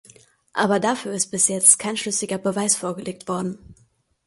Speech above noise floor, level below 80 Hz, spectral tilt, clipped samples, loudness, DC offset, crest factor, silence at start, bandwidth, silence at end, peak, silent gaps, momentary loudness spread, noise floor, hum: 39 dB; -62 dBFS; -2.5 dB/octave; under 0.1%; -20 LUFS; under 0.1%; 24 dB; 0.55 s; 12 kHz; 0.55 s; 0 dBFS; none; 16 LU; -61 dBFS; none